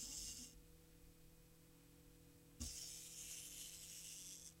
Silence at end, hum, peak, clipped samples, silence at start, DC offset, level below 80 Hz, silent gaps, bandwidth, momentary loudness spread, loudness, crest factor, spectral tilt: 0 s; none; -36 dBFS; under 0.1%; 0 s; under 0.1%; -66 dBFS; none; 16 kHz; 18 LU; -52 LUFS; 22 dB; -1.5 dB/octave